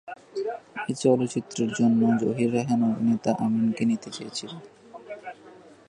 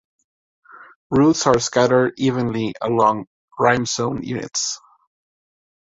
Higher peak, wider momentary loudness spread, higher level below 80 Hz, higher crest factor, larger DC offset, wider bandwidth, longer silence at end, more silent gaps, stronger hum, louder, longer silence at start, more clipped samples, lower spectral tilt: second, -8 dBFS vs -2 dBFS; first, 18 LU vs 9 LU; second, -68 dBFS vs -52 dBFS; about the same, 18 dB vs 20 dB; neither; first, 10.5 kHz vs 8 kHz; second, 0.2 s vs 1.15 s; second, none vs 0.96-1.10 s, 3.27-3.48 s; neither; second, -25 LUFS vs -19 LUFS; second, 0.05 s vs 0.75 s; neither; first, -6 dB/octave vs -4.5 dB/octave